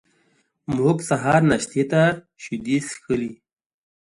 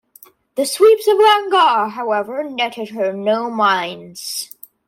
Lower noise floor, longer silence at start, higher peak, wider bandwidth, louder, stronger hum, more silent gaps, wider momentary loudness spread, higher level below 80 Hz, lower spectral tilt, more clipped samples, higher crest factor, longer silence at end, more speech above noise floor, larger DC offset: first, -65 dBFS vs -48 dBFS; first, 0.7 s vs 0.55 s; about the same, -4 dBFS vs -2 dBFS; second, 11.5 kHz vs 16.5 kHz; second, -21 LUFS vs -16 LUFS; neither; neither; about the same, 15 LU vs 14 LU; first, -54 dBFS vs -72 dBFS; first, -6 dB/octave vs -2.5 dB/octave; neither; about the same, 18 dB vs 14 dB; first, 0.7 s vs 0.45 s; first, 44 dB vs 32 dB; neither